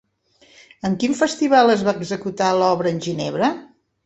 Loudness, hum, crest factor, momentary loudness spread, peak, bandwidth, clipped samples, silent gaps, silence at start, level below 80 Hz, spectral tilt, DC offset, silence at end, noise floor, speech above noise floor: -19 LUFS; none; 18 dB; 11 LU; -2 dBFS; 8.2 kHz; under 0.1%; none; 0.85 s; -60 dBFS; -5 dB/octave; under 0.1%; 0.4 s; -56 dBFS; 38 dB